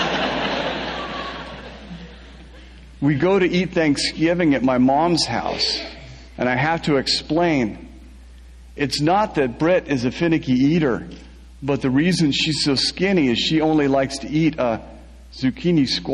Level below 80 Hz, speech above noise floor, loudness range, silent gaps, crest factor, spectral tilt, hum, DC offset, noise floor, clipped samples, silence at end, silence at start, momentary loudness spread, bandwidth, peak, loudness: -42 dBFS; 23 dB; 4 LU; none; 14 dB; -5 dB/octave; none; under 0.1%; -42 dBFS; under 0.1%; 0 s; 0 s; 13 LU; 11.5 kHz; -6 dBFS; -20 LUFS